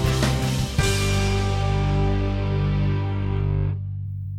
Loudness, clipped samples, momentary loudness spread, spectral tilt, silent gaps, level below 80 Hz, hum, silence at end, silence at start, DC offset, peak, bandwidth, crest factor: -23 LUFS; under 0.1%; 4 LU; -5.5 dB/octave; none; -30 dBFS; 50 Hz at -40 dBFS; 0 s; 0 s; under 0.1%; -8 dBFS; 15 kHz; 14 dB